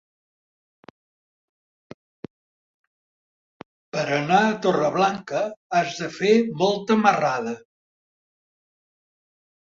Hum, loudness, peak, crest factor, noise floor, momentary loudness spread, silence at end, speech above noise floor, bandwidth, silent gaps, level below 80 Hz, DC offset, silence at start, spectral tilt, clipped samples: none; -22 LUFS; -4 dBFS; 22 dB; under -90 dBFS; 9 LU; 2.15 s; over 69 dB; 7.6 kHz; 5.56-5.70 s; -68 dBFS; under 0.1%; 3.95 s; -5 dB/octave; under 0.1%